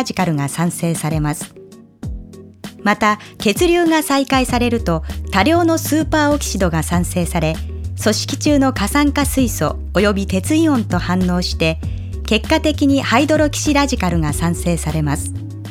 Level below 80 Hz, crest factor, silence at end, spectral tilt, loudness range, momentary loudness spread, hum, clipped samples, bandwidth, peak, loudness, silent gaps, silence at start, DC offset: -28 dBFS; 16 dB; 0 s; -5 dB/octave; 2 LU; 10 LU; none; under 0.1%; 17.5 kHz; 0 dBFS; -17 LUFS; none; 0 s; under 0.1%